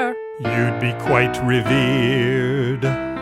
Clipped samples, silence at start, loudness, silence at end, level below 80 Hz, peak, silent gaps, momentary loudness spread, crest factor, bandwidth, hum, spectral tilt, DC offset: under 0.1%; 0 s; -19 LUFS; 0 s; -46 dBFS; 0 dBFS; none; 5 LU; 18 dB; 13.5 kHz; none; -6.5 dB/octave; under 0.1%